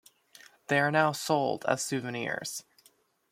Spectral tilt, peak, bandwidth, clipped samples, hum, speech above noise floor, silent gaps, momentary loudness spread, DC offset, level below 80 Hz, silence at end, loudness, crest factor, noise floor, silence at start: -4 dB/octave; -10 dBFS; 16.5 kHz; under 0.1%; none; 37 dB; none; 12 LU; under 0.1%; -76 dBFS; 0.7 s; -29 LUFS; 22 dB; -66 dBFS; 0.7 s